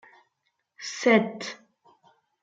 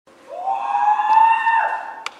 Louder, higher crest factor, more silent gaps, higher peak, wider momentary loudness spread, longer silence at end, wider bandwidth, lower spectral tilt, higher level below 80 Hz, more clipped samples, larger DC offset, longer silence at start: second, -25 LUFS vs -17 LUFS; first, 24 dB vs 14 dB; neither; about the same, -6 dBFS vs -4 dBFS; first, 18 LU vs 14 LU; first, 0.9 s vs 0.1 s; second, 7.8 kHz vs 9 kHz; first, -4.5 dB/octave vs 0 dB/octave; about the same, -80 dBFS vs -78 dBFS; neither; neither; first, 0.8 s vs 0.3 s